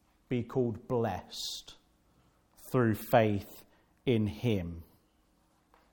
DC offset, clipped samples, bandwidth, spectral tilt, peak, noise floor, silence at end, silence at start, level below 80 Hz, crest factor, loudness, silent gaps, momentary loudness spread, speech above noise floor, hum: under 0.1%; under 0.1%; 18 kHz; -6.5 dB/octave; -10 dBFS; -70 dBFS; 1.1 s; 0.3 s; -62 dBFS; 24 dB; -32 LUFS; none; 17 LU; 39 dB; none